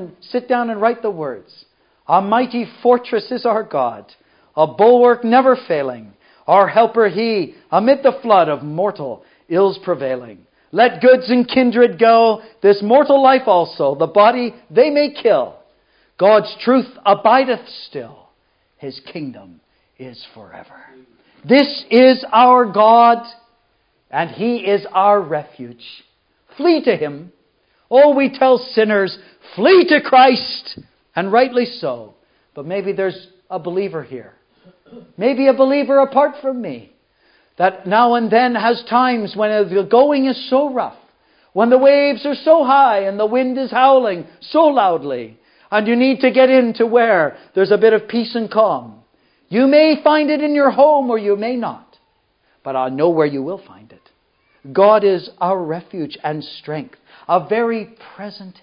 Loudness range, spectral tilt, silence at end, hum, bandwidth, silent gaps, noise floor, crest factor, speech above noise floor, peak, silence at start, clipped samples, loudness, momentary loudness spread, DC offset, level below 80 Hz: 7 LU; -9 dB/octave; 0.1 s; none; 5.4 kHz; none; -62 dBFS; 16 dB; 48 dB; 0 dBFS; 0 s; under 0.1%; -15 LUFS; 17 LU; under 0.1%; -70 dBFS